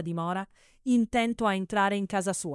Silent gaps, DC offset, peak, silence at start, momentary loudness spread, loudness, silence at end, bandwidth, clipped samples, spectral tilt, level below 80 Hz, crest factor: none; under 0.1%; -12 dBFS; 0 s; 10 LU; -28 LUFS; 0 s; 12 kHz; under 0.1%; -5 dB/octave; -58 dBFS; 16 dB